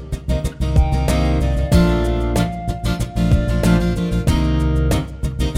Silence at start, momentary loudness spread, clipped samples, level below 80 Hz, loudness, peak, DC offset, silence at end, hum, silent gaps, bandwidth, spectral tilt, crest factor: 0 s; 7 LU; under 0.1%; -20 dBFS; -18 LUFS; -2 dBFS; under 0.1%; 0 s; none; none; 15.5 kHz; -7 dB/octave; 16 dB